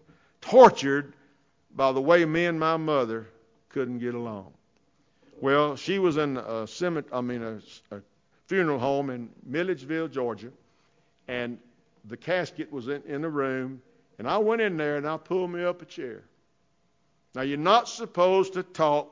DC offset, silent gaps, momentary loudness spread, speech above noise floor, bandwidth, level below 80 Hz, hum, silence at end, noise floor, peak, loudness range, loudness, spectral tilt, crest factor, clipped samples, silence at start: under 0.1%; none; 18 LU; 45 dB; 7.6 kHz; -68 dBFS; none; 0.05 s; -71 dBFS; -4 dBFS; 6 LU; -26 LUFS; -5.5 dB/octave; 24 dB; under 0.1%; 0.4 s